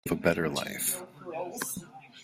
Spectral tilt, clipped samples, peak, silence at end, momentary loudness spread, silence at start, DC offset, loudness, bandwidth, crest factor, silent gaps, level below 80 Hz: -3.5 dB/octave; under 0.1%; -8 dBFS; 0 s; 13 LU; 0.05 s; under 0.1%; -32 LUFS; 16 kHz; 24 dB; none; -62 dBFS